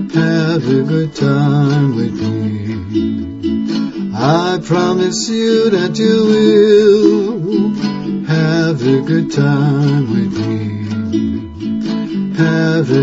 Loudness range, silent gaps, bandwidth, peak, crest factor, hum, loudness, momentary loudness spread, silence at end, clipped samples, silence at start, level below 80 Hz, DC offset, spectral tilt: 5 LU; none; 8 kHz; 0 dBFS; 14 dB; none; -14 LUFS; 9 LU; 0 s; under 0.1%; 0 s; -46 dBFS; under 0.1%; -6.5 dB/octave